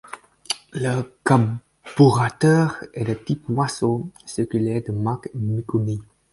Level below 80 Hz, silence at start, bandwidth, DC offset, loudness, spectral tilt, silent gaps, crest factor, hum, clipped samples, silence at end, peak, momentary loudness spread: -54 dBFS; 0.05 s; 11.5 kHz; under 0.1%; -22 LUFS; -6.5 dB/octave; none; 20 dB; none; under 0.1%; 0.3 s; 0 dBFS; 12 LU